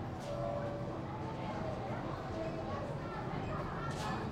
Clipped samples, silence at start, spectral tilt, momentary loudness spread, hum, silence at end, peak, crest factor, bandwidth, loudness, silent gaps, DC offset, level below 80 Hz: under 0.1%; 0 s; -7 dB/octave; 3 LU; none; 0 s; -26 dBFS; 14 dB; 14.5 kHz; -40 LUFS; none; under 0.1%; -54 dBFS